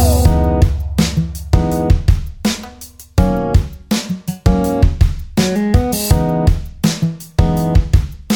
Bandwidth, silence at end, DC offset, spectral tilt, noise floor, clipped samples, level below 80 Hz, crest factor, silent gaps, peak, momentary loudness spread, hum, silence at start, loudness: 19.5 kHz; 0 s; under 0.1%; -6 dB/octave; -36 dBFS; under 0.1%; -18 dBFS; 14 dB; none; 0 dBFS; 6 LU; none; 0 s; -16 LUFS